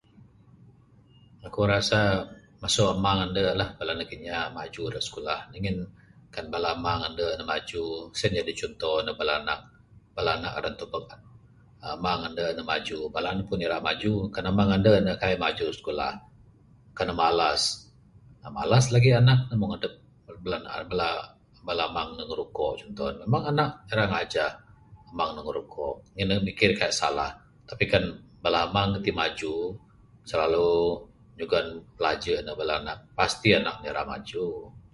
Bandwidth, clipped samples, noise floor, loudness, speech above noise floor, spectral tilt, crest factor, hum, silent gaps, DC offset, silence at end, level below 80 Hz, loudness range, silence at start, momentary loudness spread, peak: 11.5 kHz; under 0.1%; -57 dBFS; -27 LUFS; 30 dB; -5 dB/octave; 24 dB; none; none; under 0.1%; 0.15 s; -50 dBFS; 6 LU; 0.65 s; 13 LU; -4 dBFS